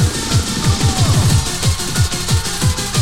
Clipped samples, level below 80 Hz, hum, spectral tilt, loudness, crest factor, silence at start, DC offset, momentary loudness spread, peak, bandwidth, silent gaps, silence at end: under 0.1%; -26 dBFS; none; -4 dB/octave; -16 LUFS; 12 dB; 0 s; 3%; 3 LU; -2 dBFS; 16.5 kHz; none; 0 s